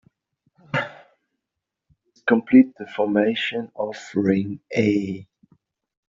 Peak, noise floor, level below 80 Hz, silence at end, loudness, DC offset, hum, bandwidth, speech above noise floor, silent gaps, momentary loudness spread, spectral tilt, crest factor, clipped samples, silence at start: -4 dBFS; -84 dBFS; -64 dBFS; 0.85 s; -22 LUFS; under 0.1%; none; 7.4 kHz; 63 dB; none; 14 LU; -5 dB/octave; 20 dB; under 0.1%; 0.75 s